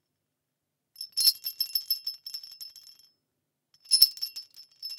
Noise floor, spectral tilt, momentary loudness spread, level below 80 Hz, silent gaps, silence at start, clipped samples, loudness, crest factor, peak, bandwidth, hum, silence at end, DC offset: -83 dBFS; 4.5 dB/octave; 22 LU; -90 dBFS; none; 1 s; under 0.1%; -25 LUFS; 30 dB; -2 dBFS; 18 kHz; none; 0 s; under 0.1%